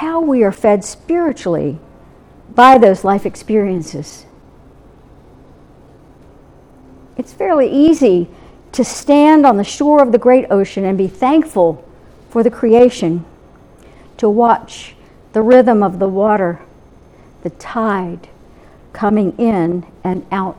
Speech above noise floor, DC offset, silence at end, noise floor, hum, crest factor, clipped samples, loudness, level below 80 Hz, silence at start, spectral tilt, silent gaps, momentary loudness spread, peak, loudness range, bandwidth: 30 dB; under 0.1%; 0.05 s; -43 dBFS; none; 14 dB; 0.1%; -13 LUFS; -46 dBFS; 0 s; -6.5 dB/octave; none; 18 LU; 0 dBFS; 8 LU; 12.5 kHz